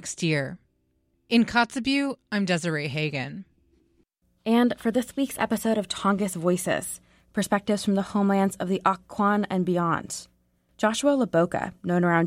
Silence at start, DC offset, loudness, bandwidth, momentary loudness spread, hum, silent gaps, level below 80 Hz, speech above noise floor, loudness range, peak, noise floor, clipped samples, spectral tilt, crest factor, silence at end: 0 s; under 0.1%; -25 LUFS; 16 kHz; 8 LU; none; none; -60 dBFS; 45 dB; 2 LU; -8 dBFS; -70 dBFS; under 0.1%; -5 dB/octave; 18 dB; 0 s